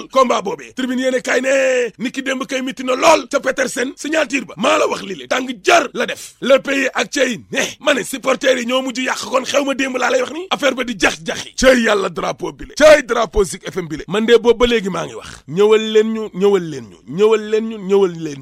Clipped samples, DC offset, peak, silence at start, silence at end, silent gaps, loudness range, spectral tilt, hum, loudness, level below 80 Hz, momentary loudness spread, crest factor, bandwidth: under 0.1%; under 0.1%; 0 dBFS; 0 s; 0 s; none; 3 LU; -3.5 dB/octave; none; -16 LUFS; -40 dBFS; 11 LU; 16 dB; 15.5 kHz